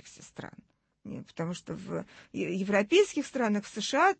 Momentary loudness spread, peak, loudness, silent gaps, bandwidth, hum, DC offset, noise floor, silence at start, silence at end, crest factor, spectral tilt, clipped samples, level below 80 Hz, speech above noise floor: 20 LU; -12 dBFS; -30 LUFS; none; 8.8 kHz; none; under 0.1%; -59 dBFS; 0.05 s; 0.05 s; 18 dB; -4.5 dB/octave; under 0.1%; -70 dBFS; 30 dB